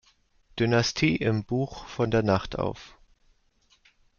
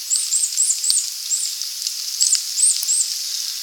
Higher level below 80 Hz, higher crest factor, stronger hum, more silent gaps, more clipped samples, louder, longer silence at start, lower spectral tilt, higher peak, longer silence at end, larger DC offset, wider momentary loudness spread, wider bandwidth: first, -50 dBFS vs -84 dBFS; about the same, 20 dB vs 20 dB; neither; neither; neither; second, -26 LUFS vs -17 LUFS; first, 0.55 s vs 0 s; first, -5.5 dB/octave vs 8 dB/octave; second, -8 dBFS vs 0 dBFS; first, 1.3 s vs 0 s; neither; about the same, 10 LU vs 8 LU; second, 7.2 kHz vs over 20 kHz